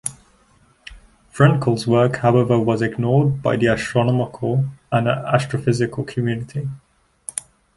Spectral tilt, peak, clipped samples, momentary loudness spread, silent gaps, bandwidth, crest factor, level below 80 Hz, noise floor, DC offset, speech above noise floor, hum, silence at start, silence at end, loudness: -6.5 dB/octave; -2 dBFS; under 0.1%; 13 LU; none; 11.5 kHz; 18 dB; -50 dBFS; -56 dBFS; under 0.1%; 38 dB; none; 0.05 s; 0.35 s; -19 LUFS